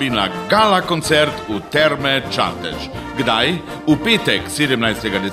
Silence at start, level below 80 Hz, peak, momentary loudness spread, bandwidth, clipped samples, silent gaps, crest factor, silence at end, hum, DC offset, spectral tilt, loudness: 0 s; -42 dBFS; 0 dBFS; 8 LU; 15.5 kHz; under 0.1%; none; 16 dB; 0 s; none; under 0.1%; -4 dB/octave; -17 LUFS